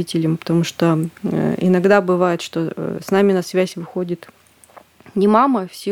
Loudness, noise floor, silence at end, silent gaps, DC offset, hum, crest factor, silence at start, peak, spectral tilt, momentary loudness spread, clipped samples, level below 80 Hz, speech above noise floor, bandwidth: -18 LUFS; -47 dBFS; 0 s; none; under 0.1%; none; 18 dB; 0 s; 0 dBFS; -6.5 dB/octave; 11 LU; under 0.1%; -60 dBFS; 29 dB; 17 kHz